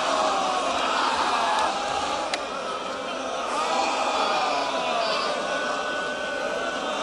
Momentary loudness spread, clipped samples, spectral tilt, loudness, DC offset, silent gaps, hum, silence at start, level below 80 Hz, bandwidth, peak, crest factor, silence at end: 6 LU; under 0.1%; -1.5 dB/octave; -25 LUFS; under 0.1%; none; none; 0 s; -58 dBFS; 11.5 kHz; -4 dBFS; 20 dB; 0 s